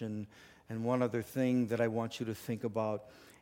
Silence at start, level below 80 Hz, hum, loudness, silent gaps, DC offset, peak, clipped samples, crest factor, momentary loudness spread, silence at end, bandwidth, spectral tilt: 0 s; -72 dBFS; none; -35 LUFS; none; under 0.1%; -18 dBFS; under 0.1%; 18 dB; 12 LU; 0.1 s; 17 kHz; -7 dB/octave